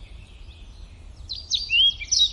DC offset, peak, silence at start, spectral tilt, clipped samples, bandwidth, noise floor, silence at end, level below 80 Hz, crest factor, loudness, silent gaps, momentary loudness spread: under 0.1%; -10 dBFS; 0 s; 1.5 dB/octave; under 0.1%; 11.5 kHz; -43 dBFS; 0 s; -44 dBFS; 16 dB; -19 LUFS; none; 18 LU